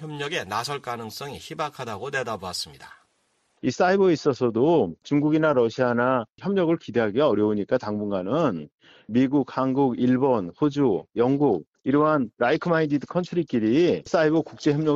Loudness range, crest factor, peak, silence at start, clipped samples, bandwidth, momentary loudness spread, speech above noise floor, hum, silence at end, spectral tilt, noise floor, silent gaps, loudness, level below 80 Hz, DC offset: 4 LU; 16 dB; -8 dBFS; 0 s; under 0.1%; 13 kHz; 10 LU; 46 dB; none; 0 s; -6.5 dB/octave; -69 dBFS; 8.74-8.78 s, 11.67-11.73 s; -23 LUFS; -62 dBFS; under 0.1%